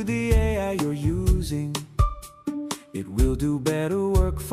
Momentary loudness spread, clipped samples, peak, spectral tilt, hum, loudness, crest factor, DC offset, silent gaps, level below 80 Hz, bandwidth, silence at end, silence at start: 10 LU; under 0.1%; -8 dBFS; -6.5 dB/octave; none; -25 LUFS; 16 dB; under 0.1%; none; -28 dBFS; 15.5 kHz; 0 s; 0 s